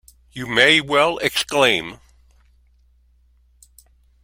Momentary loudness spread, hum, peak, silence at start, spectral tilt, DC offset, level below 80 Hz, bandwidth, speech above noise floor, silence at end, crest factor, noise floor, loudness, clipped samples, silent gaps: 20 LU; none; 0 dBFS; 0.35 s; -2.5 dB/octave; under 0.1%; -54 dBFS; 16.5 kHz; 38 dB; 2.3 s; 22 dB; -56 dBFS; -16 LUFS; under 0.1%; none